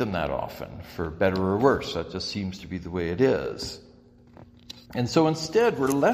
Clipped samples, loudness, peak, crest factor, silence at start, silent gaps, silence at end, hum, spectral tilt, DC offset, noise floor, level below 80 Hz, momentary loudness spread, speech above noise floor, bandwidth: under 0.1%; -26 LUFS; -6 dBFS; 20 dB; 0 s; none; 0 s; none; -5.5 dB/octave; under 0.1%; -53 dBFS; -50 dBFS; 14 LU; 28 dB; 15.5 kHz